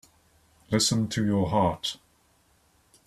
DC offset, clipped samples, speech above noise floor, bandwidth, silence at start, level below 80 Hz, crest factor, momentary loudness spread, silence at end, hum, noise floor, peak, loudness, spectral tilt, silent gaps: under 0.1%; under 0.1%; 39 dB; 14.5 kHz; 0.7 s; -56 dBFS; 20 dB; 9 LU; 1.1 s; none; -65 dBFS; -10 dBFS; -26 LUFS; -4.5 dB/octave; none